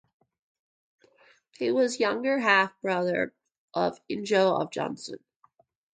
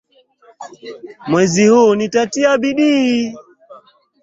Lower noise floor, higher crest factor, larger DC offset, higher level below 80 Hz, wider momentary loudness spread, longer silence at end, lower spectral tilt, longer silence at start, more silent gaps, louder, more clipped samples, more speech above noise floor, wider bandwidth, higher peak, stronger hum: first, -65 dBFS vs -50 dBFS; first, 22 dB vs 14 dB; neither; second, -74 dBFS vs -58 dBFS; second, 13 LU vs 22 LU; first, 0.75 s vs 0.45 s; about the same, -4.5 dB/octave vs -5 dB/octave; first, 1.6 s vs 0.6 s; first, 3.58-3.68 s vs none; second, -26 LUFS vs -14 LUFS; neither; about the same, 39 dB vs 36 dB; first, 9.4 kHz vs 7.8 kHz; second, -8 dBFS vs -2 dBFS; neither